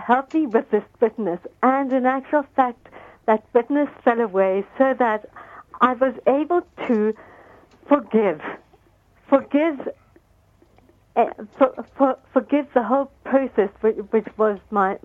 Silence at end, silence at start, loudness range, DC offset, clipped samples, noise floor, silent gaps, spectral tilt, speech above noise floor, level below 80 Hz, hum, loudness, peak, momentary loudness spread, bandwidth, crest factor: 0.05 s; 0 s; 3 LU; under 0.1%; under 0.1%; -57 dBFS; none; -8 dB/octave; 37 dB; -62 dBFS; none; -21 LUFS; -2 dBFS; 8 LU; 7.2 kHz; 18 dB